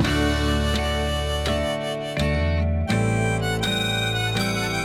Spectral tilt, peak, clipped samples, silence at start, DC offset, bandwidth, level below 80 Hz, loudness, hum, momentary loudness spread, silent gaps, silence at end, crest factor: -5 dB/octave; -8 dBFS; under 0.1%; 0 s; under 0.1%; 16 kHz; -30 dBFS; -23 LUFS; none; 3 LU; none; 0 s; 14 dB